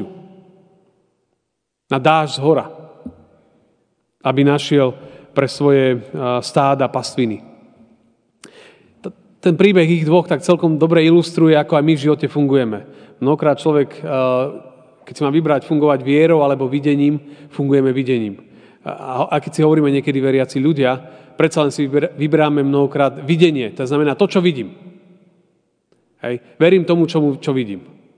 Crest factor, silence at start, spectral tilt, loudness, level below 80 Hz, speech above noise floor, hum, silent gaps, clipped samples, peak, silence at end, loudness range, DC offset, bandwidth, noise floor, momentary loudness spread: 16 dB; 0 s; -7 dB/octave; -16 LUFS; -68 dBFS; 60 dB; none; none; under 0.1%; 0 dBFS; 0.4 s; 6 LU; under 0.1%; 10 kHz; -75 dBFS; 13 LU